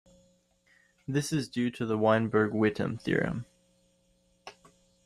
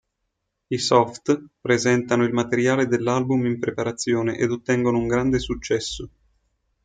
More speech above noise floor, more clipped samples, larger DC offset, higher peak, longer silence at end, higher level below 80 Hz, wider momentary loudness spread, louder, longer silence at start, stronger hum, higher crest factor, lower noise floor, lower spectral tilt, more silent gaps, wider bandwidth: second, 41 dB vs 56 dB; neither; neither; second, -12 dBFS vs -4 dBFS; second, 0.55 s vs 0.75 s; second, -62 dBFS vs -48 dBFS; first, 25 LU vs 6 LU; second, -29 LUFS vs -22 LUFS; first, 1.1 s vs 0.7 s; neither; about the same, 20 dB vs 20 dB; second, -69 dBFS vs -77 dBFS; about the same, -6 dB/octave vs -5 dB/octave; neither; first, 15 kHz vs 9.4 kHz